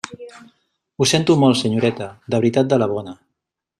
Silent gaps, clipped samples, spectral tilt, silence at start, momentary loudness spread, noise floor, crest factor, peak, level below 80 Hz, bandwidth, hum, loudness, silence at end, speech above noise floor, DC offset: none; under 0.1%; -5 dB/octave; 0.1 s; 18 LU; -79 dBFS; 18 dB; -2 dBFS; -58 dBFS; 13.5 kHz; none; -18 LUFS; 0.65 s; 62 dB; under 0.1%